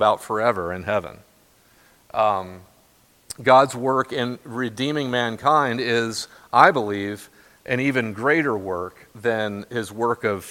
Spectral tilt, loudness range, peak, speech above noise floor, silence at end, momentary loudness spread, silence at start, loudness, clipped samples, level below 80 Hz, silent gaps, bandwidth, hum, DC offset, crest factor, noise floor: -5 dB/octave; 4 LU; 0 dBFS; 36 dB; 0 s; 14 LU; 0 s; -22 LUFS; under 0.1%; -60 dBFS; none; 17 kHz; none; under 0.1%; 22 dB; -57 dBFS